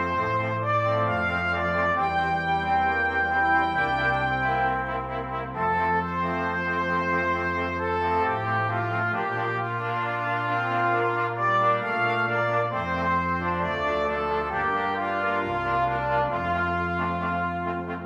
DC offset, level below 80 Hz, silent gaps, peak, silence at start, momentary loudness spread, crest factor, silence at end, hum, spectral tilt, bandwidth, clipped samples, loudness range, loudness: under 0.1%; -48 dBFS; none; -12 dBFS; 0 s; 4 LU; 14 dB; 0 s; none; -7 dB/octave; 9.6 kHz; under 0.1%; 2 LU; -25 LUFS